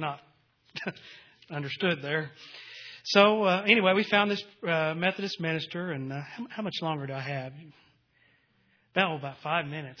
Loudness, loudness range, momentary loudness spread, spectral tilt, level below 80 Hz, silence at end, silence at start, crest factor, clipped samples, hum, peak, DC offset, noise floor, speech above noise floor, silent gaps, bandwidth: -28 LUFS; 10 LU; 19 LU; -5.5 dB/octave; -76 dBFS; 0.05 s; 0 s; 26 dB; under 0.1%; none; -4 dBFS; under 0.1%; -68 dBFS; 39 dB; none; 5.4 kHz